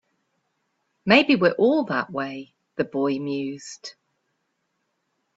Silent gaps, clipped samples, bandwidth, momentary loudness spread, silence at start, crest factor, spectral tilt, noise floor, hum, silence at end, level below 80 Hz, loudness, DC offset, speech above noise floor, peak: none; under 0.1%; 8 kHz; 20 LU; 1.05 s; 22 dB; -5.5 dB/octave; -75 dBFS; none; 1.45 s; -68 dBFS; -22 LUFS; under 0.1%; 53 dB; -2 dBFS